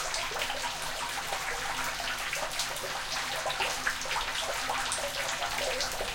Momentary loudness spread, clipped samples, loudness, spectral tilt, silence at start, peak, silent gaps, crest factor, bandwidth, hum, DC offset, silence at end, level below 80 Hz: 3 LU; under 0.1%; -31 LUFS; -0.5 dB/octave; 0 s; -14 dBFS; none; 18 dB; 17 kHz; none; under 0.1%; 0 s; -50 dBFS